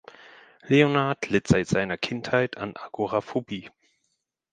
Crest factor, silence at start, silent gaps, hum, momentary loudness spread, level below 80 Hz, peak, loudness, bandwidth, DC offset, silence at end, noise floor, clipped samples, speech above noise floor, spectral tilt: 22 dB; 0.65 s; none; none; 14 LU; -54 dBFS; -4 dBFS; -25 LUFS; 9.6 kHz; under 0.1%; 0.85 s; -77 dBFS; under 0.1%; 52 dB; -6 dB/octave